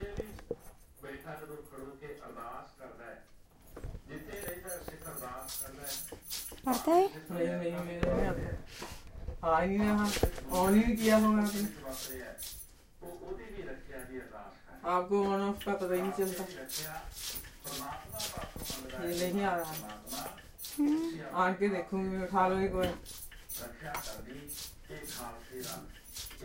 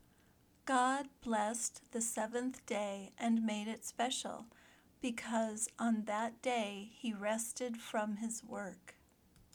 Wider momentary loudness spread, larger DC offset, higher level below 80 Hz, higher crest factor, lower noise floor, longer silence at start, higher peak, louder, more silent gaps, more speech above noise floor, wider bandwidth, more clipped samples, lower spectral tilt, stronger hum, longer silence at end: first, 18 LU vs 9 LU; neither; first, -50 dBFS vs -76 dBFS; about the same, 22 dB vs 18 dB; second, -57 dBFS vs -69 dBFS; second, 0 s vs 0.65 s; first, -14 dBFS vs -20 dBFS; first, -34 LUFS vs -38 LUFS; neither; second, 26 dB vs 30 dB; second, 16 kHz vs 19.5 kHz; neither; first, -5 dB/octave vs -3 dB/octave; neither; second, 0 s vs 0.65 s